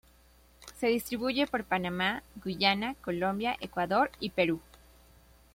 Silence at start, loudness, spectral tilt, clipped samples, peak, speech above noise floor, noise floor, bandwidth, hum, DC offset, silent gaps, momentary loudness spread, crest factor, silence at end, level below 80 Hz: 0.6 s; -31 LUFS; -5 dB/octave; under 0.1%; -12 dBFS; 30 dB; -61 dBFS; 16.5 kHz; none; under 0.1%; none; 7 LU; 20 dB; 0.95 s; -58 dBFS